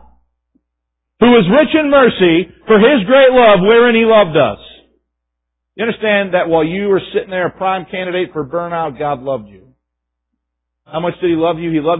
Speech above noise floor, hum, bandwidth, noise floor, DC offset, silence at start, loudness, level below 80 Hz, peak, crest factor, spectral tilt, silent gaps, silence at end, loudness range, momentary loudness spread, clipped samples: 64 dB; 60 Hz at -45 dBFS; 4 kHz; -76 dBFS; under 0.1%; 1.2 s; -12 LUFS; -46 dBFS; 0 dBFS; 14 dB; -10.5 dB/octave; none; 0 s; 12 LU; 12 LU; under 0.1%